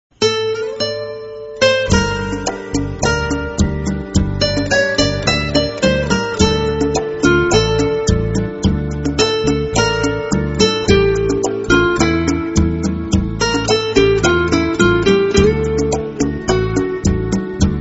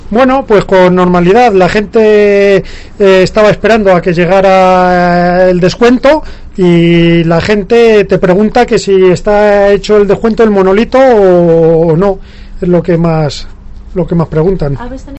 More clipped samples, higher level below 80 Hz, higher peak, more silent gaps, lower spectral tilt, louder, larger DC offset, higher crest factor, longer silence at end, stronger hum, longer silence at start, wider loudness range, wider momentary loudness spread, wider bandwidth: second, under 0.1% vs 2%; about the same, -28 dBFS vs -26 dBFS; about the same, 0 dBFS vs 0 dBFS; neither; second, -5 dB/octave vs -7 dB/octave; second, -16 LUFS vs -7 LUFS; neither; first, 16 dB vs 6 dB; about the same, 0 s vs 0 s; neither; first, 0.2 s vs 0.05 s; about the same, 3 LU vs 2 LU; about the same, 7 LU vs 7 LU; about the same, 8 kHz vs 8.4 kHz